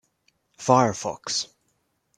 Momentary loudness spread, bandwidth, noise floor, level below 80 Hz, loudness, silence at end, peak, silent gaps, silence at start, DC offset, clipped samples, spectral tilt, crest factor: 11 LU; 12.5 kHz; -72 dBFS; -66 dBFS; -23 LUFS; 0.7 s; -2 dBFS; none; 0.6 s; under 0.1%; under 0.1%; -4 dB/octave; 24 dB